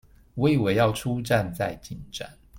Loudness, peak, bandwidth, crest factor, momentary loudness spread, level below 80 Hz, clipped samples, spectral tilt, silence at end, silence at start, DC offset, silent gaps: -25 LUFS; -8 dBFS; 16.5 kHz; 18 dB; 16 LU; -50 dBFS; under 0.1%; -6 dB/octave; 0 s; 0.35 s; under 0.1%; none